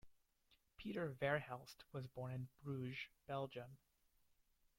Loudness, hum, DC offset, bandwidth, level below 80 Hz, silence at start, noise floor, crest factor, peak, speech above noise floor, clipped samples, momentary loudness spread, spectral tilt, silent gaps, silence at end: -48 LUFS; none; under 0.1%; 16.5 kHz; -76 dBFS; 0.05 s; -79 dBFS; 22 dB; -28 dBFS; 32 dB; under 0.1%; 12 LU; -6.5 dB/octave; none; 1.05 s